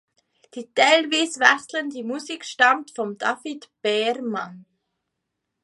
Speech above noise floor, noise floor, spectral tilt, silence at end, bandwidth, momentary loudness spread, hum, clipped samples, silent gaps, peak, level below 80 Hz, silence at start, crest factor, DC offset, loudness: 58 dB; -80 dBFS; -2 dB/octave; 1 s; 11.5 kHz; 15 LU; none; under 0.1%; none; 0 dBFS; -78 dBFS; 0.55 s; 24 dB; under 0.1%; -21 LUFS